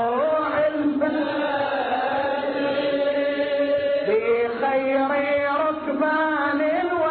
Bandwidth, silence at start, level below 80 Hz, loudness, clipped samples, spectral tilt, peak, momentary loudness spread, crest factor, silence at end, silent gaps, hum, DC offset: 4.5 kHz; 0 s; -60 dBFS; -22 LUFS; under 0.1%; -2.5 dB/octave; -10 dBFS; 3 LU; 12 dB; 0 s; none; none; under 0.1%